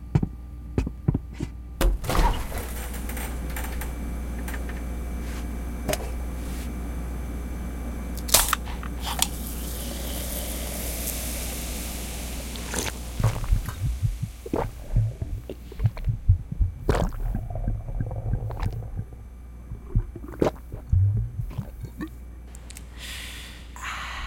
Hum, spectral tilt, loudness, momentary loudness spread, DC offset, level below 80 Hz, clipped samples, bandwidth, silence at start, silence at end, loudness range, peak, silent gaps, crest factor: none; -4.5 dB/octave; -29 LUFS; 12 LU; under 0.1%; -32 dBFS; under 0.1%; 17 kHz; 0 s; 0 s; 6 LU; 0 dBFS; none; 28 dB